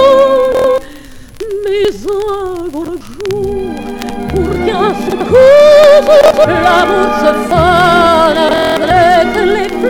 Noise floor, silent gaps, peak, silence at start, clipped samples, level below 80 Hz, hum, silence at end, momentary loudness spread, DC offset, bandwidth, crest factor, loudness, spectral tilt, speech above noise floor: -31 dBFS; none; 0 dBFS; 0 s; under 0.1%; -32 dBFS; none; 0 s; 16 LU; under 0.1%; 17 kHz; 10 dB; -9 LUFS; -5 dB/octave; 21 dB